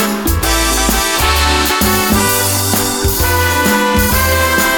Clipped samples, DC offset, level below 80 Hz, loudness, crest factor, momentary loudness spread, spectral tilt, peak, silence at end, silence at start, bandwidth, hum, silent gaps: under 0.1%; under 0.1%; -22 dBFS; -12 LUFS; 12 dB; 2 LU; -3 dB/octave; 0 dBFS; 0 s; 0 s; 19.5 kHz; none; none